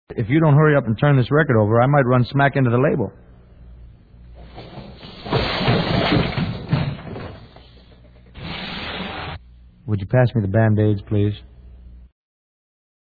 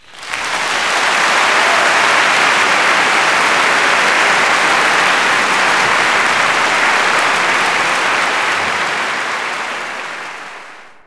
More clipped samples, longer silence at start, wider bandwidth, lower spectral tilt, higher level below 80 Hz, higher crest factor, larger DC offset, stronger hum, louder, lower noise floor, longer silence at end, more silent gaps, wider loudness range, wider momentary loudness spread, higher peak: neither; about the same, 0.1 s vs 0.1 s; second, 4.9 kHz vs 11 kHz; first, -9.5 dB/octave vs -0.5 dB/octave; first, -42 dBFS vs -56 dBFS; about the same, 18 dB vs 14 dB; neither; neither; second, -19 LUFS vs -12 LUFS; first, -46 dBFS vs -36 dBFS; first, 1.05 s vs 0.15 s; neither; first, 10 LU vs 4 LU; first, 21 LU vs 10 LU; about the same, -2 dBFS vs 0 dBFS